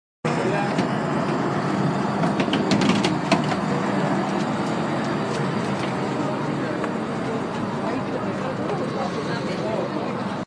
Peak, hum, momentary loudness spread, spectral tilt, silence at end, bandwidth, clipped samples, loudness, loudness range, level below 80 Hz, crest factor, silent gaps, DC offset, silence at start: -4 dBFS; none; 6 LU; -6 dB/octave; 0 s; 10.5 kHz; under 0.1%; -24 LUFS; 4 LU; -58 dBFS; 20 dB; none; under 0.1%; 0.25 s